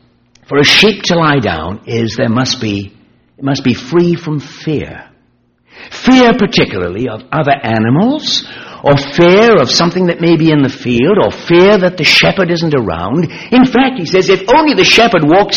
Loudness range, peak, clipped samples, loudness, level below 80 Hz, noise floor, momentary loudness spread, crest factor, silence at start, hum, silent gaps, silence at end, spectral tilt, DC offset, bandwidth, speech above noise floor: 6 LU; 0 dBFS; under 0.1%; -10 LUFS; -40 dBFS; -54 dBFS; 12 LU; 10 dB; 0.5 s; none; none; 0 s; -5 dB/octave; under 0.1%; 13.5 kHz; 44 dB